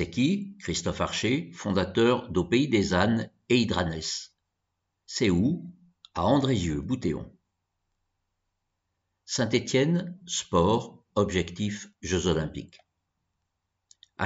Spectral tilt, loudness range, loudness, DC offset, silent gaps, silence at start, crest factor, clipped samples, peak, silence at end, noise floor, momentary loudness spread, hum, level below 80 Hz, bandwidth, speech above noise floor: -5 dB/octave; 5 LU; -27 LUFS; under 0.1%; none; 0 s; 20 dB; under 0.1%; -8 dBFS; 0 s; -81 dBFS; 11 LU; none; -50 dBFS; 8 kHz; 55 dB